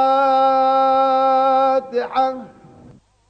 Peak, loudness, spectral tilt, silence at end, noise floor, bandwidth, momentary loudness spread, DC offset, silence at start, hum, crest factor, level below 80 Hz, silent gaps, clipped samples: -8 dBFS; -16 LUFS; -5 dB/octave; 0.85 s; -47 dBFS; 6.4 kHz; 7 LU; under 0.1%; 0 s; none; 10 dB; -62 dBFS; none; under 0.1%